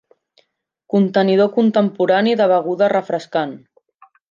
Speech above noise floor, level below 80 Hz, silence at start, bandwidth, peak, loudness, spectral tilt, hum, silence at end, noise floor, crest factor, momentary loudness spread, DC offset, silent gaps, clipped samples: 47 dB; -70 dBFS; 0.95 s; 7.4 kHz; -2 dBFS; -17 LUFS; -7.5 dB/octave; none; 0.75 s; -63 dBFS; 14 dB; 7 LU; under 0.1%; none; under 0.1%